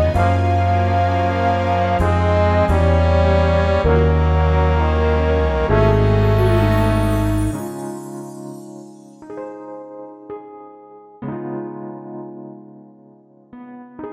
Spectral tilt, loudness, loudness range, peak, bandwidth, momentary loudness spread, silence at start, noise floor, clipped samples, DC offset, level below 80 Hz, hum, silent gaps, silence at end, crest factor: -8 dB/octave; -17 LUFS; 17 LU; -4 dBFS; 13 kHz; 19 LU; 0 s; -48 dBFS; under 0.1%; under 0.1%; -24 dBFS; none; none; 0 s; 14 dB